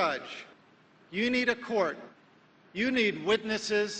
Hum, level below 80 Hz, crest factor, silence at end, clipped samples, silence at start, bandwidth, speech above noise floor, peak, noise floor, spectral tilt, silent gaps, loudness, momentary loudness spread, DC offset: none; -68 dBFS; 18 dB; 0 s; under 0.1%; 0 s; 9.2 kHz; 31 dB; -14 dBFS; -61 dBFS; -3.5 dB/octave; none; -29 LUFS; 15 LU; under 0.1%